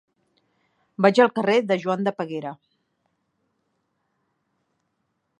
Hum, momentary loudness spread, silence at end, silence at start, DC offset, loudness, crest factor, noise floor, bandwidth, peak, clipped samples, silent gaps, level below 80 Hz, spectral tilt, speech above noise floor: none; 16 LU; 2.85 s; 1 s; under 0.1%; -21 LUFS; 24 dB; -75 dBFS; 10 kHz; -2 dBFS; under 0.1%; none; -78 dBFS; -6 dB/octave; 54 dB